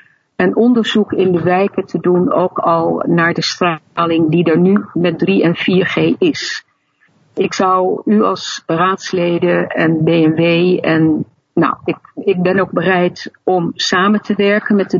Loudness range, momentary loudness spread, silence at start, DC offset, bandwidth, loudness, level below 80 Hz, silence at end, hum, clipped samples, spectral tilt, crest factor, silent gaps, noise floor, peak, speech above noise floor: 2 LU; 7 LU; 0.4 s; under 0.1%; 7.6 kHz; -14 LUFS; -58 dBFS; 0 s; none; under 0.1%; -6 dB/octave; 14 dB; none; -57 dBFS; 0 dBFS; 43 dB